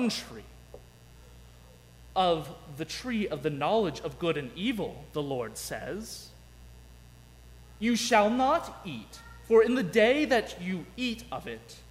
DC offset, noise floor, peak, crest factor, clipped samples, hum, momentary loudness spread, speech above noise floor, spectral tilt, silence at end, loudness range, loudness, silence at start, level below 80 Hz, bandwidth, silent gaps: under 0.1%; -53 dBFS; -10 dBFS; 20 dB; under 0.1%; 60 Hz at -60 dBFS; 18 LU; 24 dB; -4.5 dB/octave; 0 s; 9 LU; -29 LUFS; 0 s; -54 dBFS; 16 kHz; none